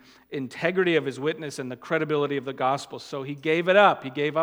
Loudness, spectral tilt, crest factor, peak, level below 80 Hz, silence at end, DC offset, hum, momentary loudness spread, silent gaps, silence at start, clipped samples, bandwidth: -25 LUFS; -5.5 dB/octave; 22 dB; -4 dBFS; -74 dBFS; 0 s; under 0.1%; none; 16 LU; none; 0.3 s; under 0.1%; 16.5 kHz